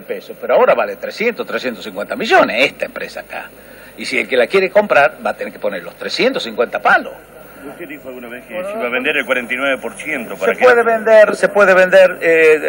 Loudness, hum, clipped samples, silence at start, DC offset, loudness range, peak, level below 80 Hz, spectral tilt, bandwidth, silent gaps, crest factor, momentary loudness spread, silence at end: -14 LUFS; none; under 0.1%; 0 s; under 0.1%; 7 LU; 0 dBFS; -56 dBFS; -4 dB/octave; 16.5 kHz; none; 14 dB; 19 LU; 0 s